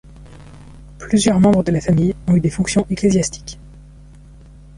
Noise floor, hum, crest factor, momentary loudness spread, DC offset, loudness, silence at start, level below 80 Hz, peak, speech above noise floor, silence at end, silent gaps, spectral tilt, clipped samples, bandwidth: -41 dBFS; none; 16 dB; 20 LU; under 0.1%; -16 LUFS; 0.2 s; -38 dBFS; -2 dBFS; 25 dB; 1 s; none; -6 dB/octave; under 0.1%; 11.5 kHz